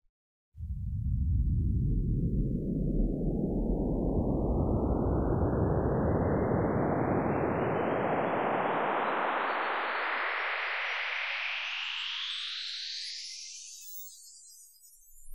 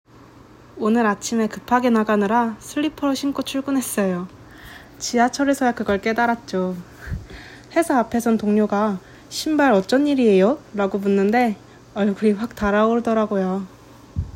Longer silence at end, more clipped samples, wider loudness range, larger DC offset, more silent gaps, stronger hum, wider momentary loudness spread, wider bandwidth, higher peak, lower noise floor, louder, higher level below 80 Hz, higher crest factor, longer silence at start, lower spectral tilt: about the same, 0 s vs 0.05 s; neither; about the same, 5 LU vs 4 LU; first, 0.2% vs under 0.1%; first, 0.09-0.52 s vs none; neither; second, 11 LU vs 16 LU; about the same, 16 kHz vs 16.5 kHz; second, -16 dBFS vs -6 dBFS; first, -57 dBFS vs -46 dBFS; second, -31 LUFS vs -20 LUFS; first, -38 dBFS vs -46 dBFS; about the same, 14 dB vs 16 dB; second, 0.05 s vs 0.75 s; about the same, -6 dB/octave vs -5.5 dB/octave